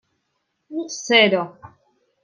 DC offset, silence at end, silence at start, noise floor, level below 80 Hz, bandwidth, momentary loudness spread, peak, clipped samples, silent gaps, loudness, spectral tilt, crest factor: under 0.1%; 0.55 s; 0.7 s; -74 dBFS; -70 dBFS; 10 kHz; 18 LU; -2 dBFS; under 0.1%; none; -18 LUFS; -3 dB/octave; 20 dB